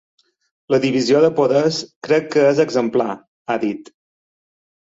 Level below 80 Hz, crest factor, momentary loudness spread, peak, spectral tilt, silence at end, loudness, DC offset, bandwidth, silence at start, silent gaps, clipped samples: -62 dBFS; 16 dB; 11 LU; -2 dBFS; -5.5 dB/octave; 1.05 s; -18 LUFS; under 0.1%; 7.8 kHz; 0.7 s; 1.96-2.01 s, 3.28-3.45 s; under 0.1%